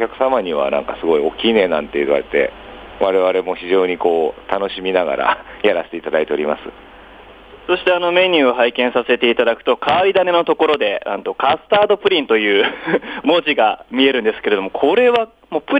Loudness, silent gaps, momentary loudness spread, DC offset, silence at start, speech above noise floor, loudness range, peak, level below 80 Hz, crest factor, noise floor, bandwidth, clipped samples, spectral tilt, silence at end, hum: -16 LUFS; none; 7 LU; under 0.1%; 0 s; 24 dB; 4 LU; -2 dBFS; -50 dBFS; 16 dB; -40 dBFS; 5.2 kHz; under 0.1%; -6 dB/octave; 0 s; none